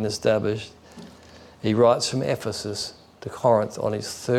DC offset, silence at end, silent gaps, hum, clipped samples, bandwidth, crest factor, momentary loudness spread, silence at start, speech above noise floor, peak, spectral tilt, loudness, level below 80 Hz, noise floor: under 0.1%; 0 s; none; none; under 0.1%; 15.5 kHz; 16 dB; 21 LU; 0 s; 25 dB; -8 dBFS; -5 dB/octave; -24 LUFS; -60 dBFS; -48 dBFS